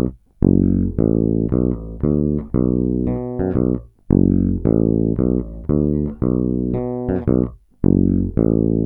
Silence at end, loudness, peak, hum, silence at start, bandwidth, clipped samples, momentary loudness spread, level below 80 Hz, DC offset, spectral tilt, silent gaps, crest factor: 0 s; -19 LUFS; 0 dBFS; none; 0 s; 2.5 kHz; under 0.1%; 6 LU; -30 dBFS; under 0.1%; -14.5 dB/octave; none; 18 dB